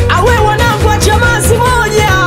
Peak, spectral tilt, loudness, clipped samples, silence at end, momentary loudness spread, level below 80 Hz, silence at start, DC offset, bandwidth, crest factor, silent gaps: 0 dBFS; -4.5 dB/octave; -9 LUFS; 0.2%; 0 s; 1 LU; -18 dBFS; 0 s; 0.7%; 16.5 kHz; 8 dB; none